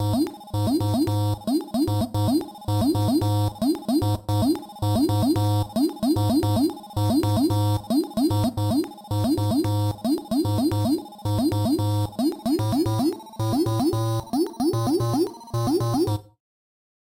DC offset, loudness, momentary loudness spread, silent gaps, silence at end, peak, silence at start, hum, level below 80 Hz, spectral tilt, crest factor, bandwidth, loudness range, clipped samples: under 0.1%; -24 LUFS; 5 LU; none; 0.95 s; -12 dBFS; 0 s; none; -46 dBFS; -7 dB/octave; 10 dB; 16.5 kHz; 1 LU; under 0.1%